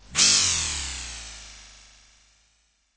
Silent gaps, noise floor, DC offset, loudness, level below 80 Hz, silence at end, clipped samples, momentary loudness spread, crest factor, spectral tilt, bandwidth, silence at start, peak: none; -67 dBFS; under 0.1%; -20 LUFS; -46 dBFS; 1.3 s; under 0.1%; 24 LU; 22 dB; 0.5 dB/octave; 8 kHz; 0.1 s; -6 dBFS